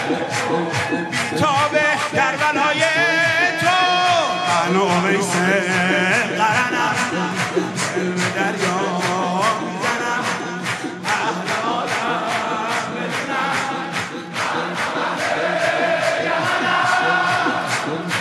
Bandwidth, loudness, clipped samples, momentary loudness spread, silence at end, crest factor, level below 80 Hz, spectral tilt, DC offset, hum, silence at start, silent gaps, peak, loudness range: 14 kHz; -19 LUFS; under 0.1%; 6 LU; 0 s; 16 dB; -64 dBFS; -3.5 dB/octave; under 0.1%; none; 0 s; none; -2 dBFS; 5 LU